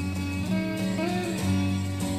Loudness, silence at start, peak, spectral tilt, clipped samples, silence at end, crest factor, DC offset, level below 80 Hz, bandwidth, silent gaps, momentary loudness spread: -28 LUFS; 0 s; -14 dBFS; -6 dB/octave; under 0.1%; 0 s; 12 dB; under 0.1%; -50 dBFS; 15.5 kHz; none; 3 LU